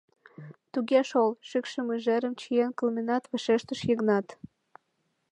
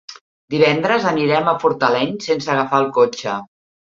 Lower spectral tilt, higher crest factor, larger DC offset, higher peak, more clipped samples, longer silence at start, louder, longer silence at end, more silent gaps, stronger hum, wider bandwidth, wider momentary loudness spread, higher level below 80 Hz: about the same, -5.5 dB/octave vs -5.5 dB/octave; about the same, 18 dB vs 16 dB; neither; second, -10 dBFS vs -2 dBFS; neither; first, 0.4 s vs 0.1 s; second, -28 LUFS vs -17 LUFS; first, 0.85 s vs 0.4 s; second, none vs 0.21-0.48 s; neither; first, 9.6 kHz vs 7.6 kHz; about the same, 10 LU vs 9 LU; second, -74 dBFS vs -62 dBFS